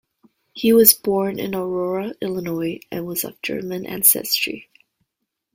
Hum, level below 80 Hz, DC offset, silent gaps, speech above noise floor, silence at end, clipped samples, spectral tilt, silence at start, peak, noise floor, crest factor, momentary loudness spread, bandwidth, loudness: none; -60 dBFS; under 0.1%; none; 59 dB; 0.95 s; under 0.1%; -3 dB/octave; 0.55 s; 0 dBFS; -79 dBFS; 22 dB; 15 LU; 16.5 kHz; -19 LUFS